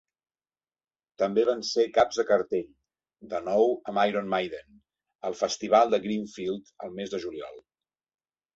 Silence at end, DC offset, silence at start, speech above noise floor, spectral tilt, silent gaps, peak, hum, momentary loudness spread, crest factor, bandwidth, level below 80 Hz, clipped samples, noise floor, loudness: 0.95 s; under 0.1%; 1.2 s; over 63 dB; -4.5 dB/octave; 5.15-5.19 s; -8 dBFS; none; 14 LU; 20 dB; 8 kHz; -68 dBFS; under 0.1%; under -90 dBFS; -27 LUFS